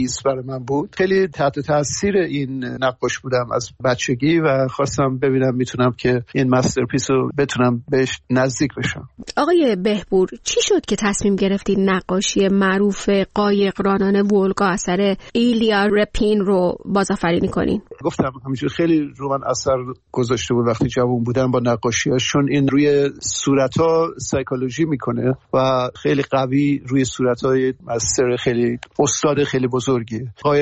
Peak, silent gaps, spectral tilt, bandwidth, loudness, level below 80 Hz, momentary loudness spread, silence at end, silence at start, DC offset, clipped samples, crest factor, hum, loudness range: -4 dBFS; none; -5 dB/octave; 8.8 kHz; -19 LUFS; -44 dBFS; 6 LU; 0 s; 0 s; under 0.1%; under 0.1%; 14 dB; none; 3 LU